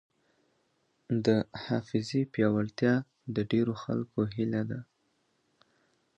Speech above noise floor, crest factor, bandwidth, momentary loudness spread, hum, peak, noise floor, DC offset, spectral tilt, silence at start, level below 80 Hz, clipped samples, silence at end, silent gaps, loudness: 45 dB; 20 dB; 8.2 kHz; 6 LU; none; -12 dBFS; -74 dBFS; under 0.1%; -7.5 dB/octave; 1.1 s; -64 dBFS; under 0.1%; 1.35 s; none; -31 LUFS